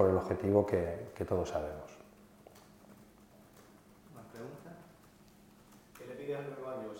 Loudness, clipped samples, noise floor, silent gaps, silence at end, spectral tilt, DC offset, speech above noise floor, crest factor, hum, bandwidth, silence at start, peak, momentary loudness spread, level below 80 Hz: -35 LUFS; under 0.1%; -60 dBFS; none; 0 s; -7.5 dB/octave; under 0.1%; 28 dB; 24 dB; none; 16.5 kHz; 0 s; -12 dBFS; 28 LU; -64 dBFS